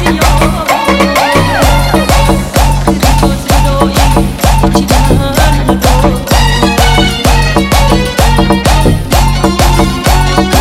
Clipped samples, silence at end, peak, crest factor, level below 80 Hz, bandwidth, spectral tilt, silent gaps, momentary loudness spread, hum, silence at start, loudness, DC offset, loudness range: 0.2%; 0 s; 0 dBFS; 8 dB; -12 dBFS; 16.5 kHz; -5 dB/octave; none; 2 LU; none; 0 s; -9 LUFS; 1%; 1 LU